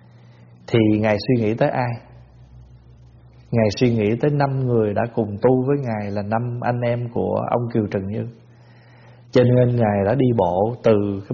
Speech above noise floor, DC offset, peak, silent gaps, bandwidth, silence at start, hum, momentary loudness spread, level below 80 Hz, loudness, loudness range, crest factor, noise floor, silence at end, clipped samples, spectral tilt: 28 dB; under 0.1%; -4 dBFS; none; 7 kHz; 0.7 s; none; 8 LU; -50 dBFS; -20 LUFS; 3 LU; 18 dB; -47 dBFS; 0 s; under 0.1%; -7 dB/octave